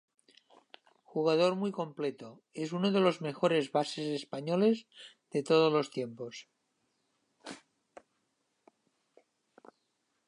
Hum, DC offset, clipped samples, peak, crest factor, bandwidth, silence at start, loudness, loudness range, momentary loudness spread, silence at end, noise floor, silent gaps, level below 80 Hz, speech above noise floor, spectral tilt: none; under 0.1%; under 0.1%; -14 dBFS; 20 dB; 11 kHz; 1.15 s; -31 LUFS; 6 LU; 21 LU; 2.7 s; -79 dBFS; none; -84 dBFS; 48 dB; -6 dB/octave